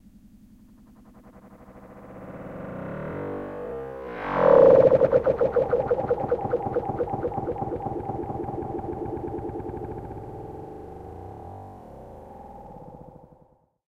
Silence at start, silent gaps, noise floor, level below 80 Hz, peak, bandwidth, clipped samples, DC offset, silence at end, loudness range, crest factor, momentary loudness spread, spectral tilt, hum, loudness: 0.25 s; none; -60 dBFS; -50 dBFS; -4 dBFS; 5.2 kHz; under 0.1%; under 0.1%; 0.7 s; 20 LU; 22 dB; 25 LU; -9.5 dB/octave; none; -24 LUFS